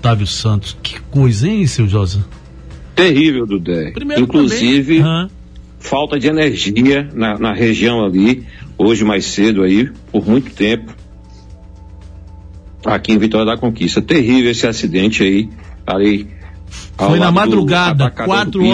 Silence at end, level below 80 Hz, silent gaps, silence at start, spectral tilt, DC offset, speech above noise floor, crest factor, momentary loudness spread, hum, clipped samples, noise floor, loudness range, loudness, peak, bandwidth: 0 s; -36 dBFS; none; 0 s; -6 dB/octave; under 0.1%; 23 dB; 14 dB; 9 LU; none; under 0.1%; -36 dBFS; 4 LU; -14 LUFS; 0 dBFS; 10.5 kHz